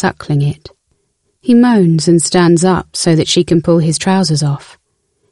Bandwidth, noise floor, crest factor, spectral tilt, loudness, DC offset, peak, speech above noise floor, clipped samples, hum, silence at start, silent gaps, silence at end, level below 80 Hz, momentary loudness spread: 11.5 kHz; -63 dBFS; 12 dB; -5.5 dB/octave; -12 LUFS; under 0.1%; 0 dBFS; 52 dB; under 0.1%; none; 0 s; none; 0.75 s; -44 dBFS; 9 LU